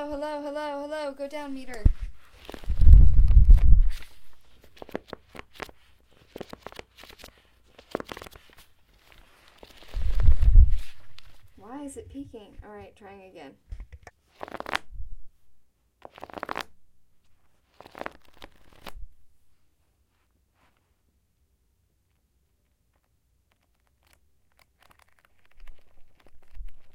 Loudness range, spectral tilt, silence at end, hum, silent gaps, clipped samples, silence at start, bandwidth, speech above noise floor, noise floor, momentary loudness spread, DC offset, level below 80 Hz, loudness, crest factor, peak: 21 LU; -7 dB/octave; 0.15 s; none; none; under 0.1%; 0 s; 8.6 kHz; 39 dB; -70 dBFS; 28 LU; under 0.1%; -26 dBFS; -26 LUFS; 24 dB; 0 dBFS